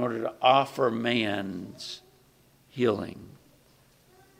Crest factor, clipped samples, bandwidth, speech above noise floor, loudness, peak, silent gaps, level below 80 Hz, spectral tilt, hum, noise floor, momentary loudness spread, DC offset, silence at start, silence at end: 22 dB; under 0.1%; 16 kHz; 34 dB; -27 LUFS; -6 dBFS; none; -68 dBFS; -5.5 dB/octave; none; -61 dBFS; 19 LU; under 0.1%; 0 s; 1.1 s